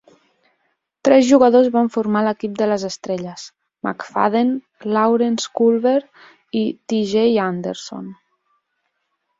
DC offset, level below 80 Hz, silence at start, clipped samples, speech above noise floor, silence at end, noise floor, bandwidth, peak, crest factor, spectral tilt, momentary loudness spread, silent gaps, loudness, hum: under 0.1%; -64 dBFS; 1.05 s; under 0.1%; 55 dB; 1.25 s; -72 dBFS; 7.8 kHz; 0 dBFS; 18 dB; -5.5 dB/octave; 15 LU; none; -18 LUFS; none